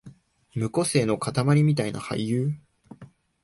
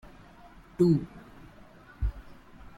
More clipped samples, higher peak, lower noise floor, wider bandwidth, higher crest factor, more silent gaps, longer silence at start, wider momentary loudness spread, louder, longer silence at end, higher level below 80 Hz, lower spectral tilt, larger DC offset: neither; first, -8 dBFS vs -12 dBFS; about the same, -50 dBFS vs -52 dBFS; first, 11.5 kHz vs 10 kHz; about the same, 16 dB vs 20 dB; neither; second, 0.05 s vs 0.8 s; second, 10 LU vs 26 LU; first, -25 LUFS vs -28 LUFS; first, 0.4 s vs 0.1 s; second, -58 dBFS vs -42 dBFS; second, -6 dB/octave vs -9.5 dB/octave; neither